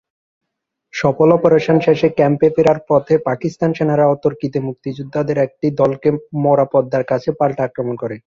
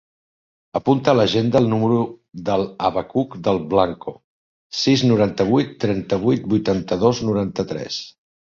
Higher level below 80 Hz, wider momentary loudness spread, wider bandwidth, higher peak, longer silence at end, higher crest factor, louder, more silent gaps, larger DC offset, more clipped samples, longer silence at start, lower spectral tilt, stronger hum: about the same, -54 dBFS vs -50 dBFS; second, 9 LU vs 12 LU; about the same, 7.2 kHz vs 7.6 kHz; about the same, 0 dBFS vs -2 dBFS; second, 0.1 s vs 0.35 s; about the same, 16 dB vs 18 dB; first, -16 LUFS vs -20 LUFS; second, none vs 4.24-4.70 s; neither; neither; first, 0.95 s vs 0.75 s; first, -8 dB/octave vs -6.5 dB/octave; neither